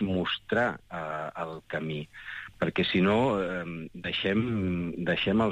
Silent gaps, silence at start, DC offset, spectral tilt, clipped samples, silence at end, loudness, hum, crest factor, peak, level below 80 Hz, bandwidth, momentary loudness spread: none; 0 s; under 0.1%; -7 dB/octave; under 0.1%; 0 s; -29 LUFS; none; 16 dB; -14 dBFS; -56 dBFS; 9.2 kHz; 13 LU